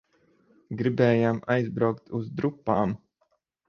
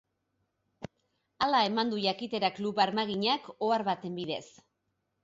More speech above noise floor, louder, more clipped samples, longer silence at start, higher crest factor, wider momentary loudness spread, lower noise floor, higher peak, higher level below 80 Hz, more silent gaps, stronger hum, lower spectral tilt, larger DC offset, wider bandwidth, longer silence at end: about the same, 47 dB vs 50 dB; first, -26 LUFS vs -30 LUFS; neither; about the same, 0.7 s vs 0.8 s; about the same, 20 dB vs 20 dB; second, 11 LU vs 16 LU; second, -72 dBFS vs -80 dBFS; first, -8 dBFS vs -12 dBFS; first, -60 dBFS vs -72 dBFS; neither; neither; first, -9 dB/octave vs -5 dB/octave; neither; second, 6.8 kHz vs 7.8 kHz; about the same, 0.7 s vs 0.75 s